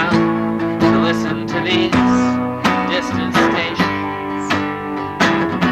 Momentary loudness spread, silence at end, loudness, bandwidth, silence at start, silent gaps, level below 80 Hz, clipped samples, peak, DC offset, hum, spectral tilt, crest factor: 7 LU; 0 s; -17 LUFS; 13.5 kHz; 0 s; none; -44 dBFS; under 0.1%; -2 dBFS; under 0.1%; none; -5.5 dB/octave; 14 dB